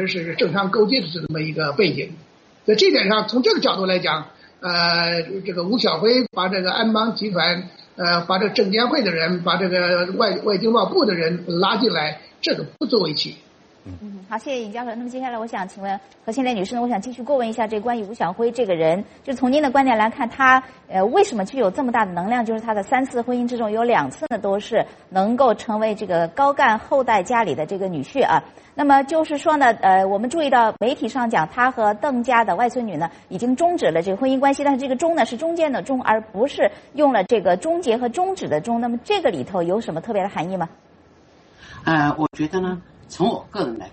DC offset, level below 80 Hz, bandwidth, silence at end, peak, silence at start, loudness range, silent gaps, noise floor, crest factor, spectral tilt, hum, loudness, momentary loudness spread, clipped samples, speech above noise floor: under 0.1%; -58 dBFS; 8.8 kHz; 0.05 s; 0 dBFS; 0 s; 6 LU; none; -51 dBFS; 20 dB; -5 dB/octave; none; -20 LUFS; 10 LU; under 0.1%; 31 dB